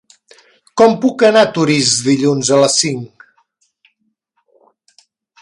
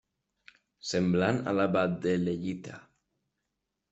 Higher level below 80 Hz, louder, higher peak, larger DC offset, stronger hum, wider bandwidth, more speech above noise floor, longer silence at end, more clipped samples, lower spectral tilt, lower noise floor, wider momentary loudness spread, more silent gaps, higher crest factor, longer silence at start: first, -60 dBFS vs -66 dBFS; first, -12 LUFS vs -29 LUFS; first, 0 dBFS vs -12 dBFS; neither; neither; first, 11.5 kHz vs 8 kHz; about the same, 54 dB vs 55 dB; first, 2.35 s vs 1.1 s; neither; second, -3.5 dB/octave vs -6.5 dB/octave; second, -66 dBFS vs -84 dBFS; second, 11 LU vs 15 LU; neither; about the same, 16 dB vs 20 dB; about the same, 0.75 s vs 0.85 s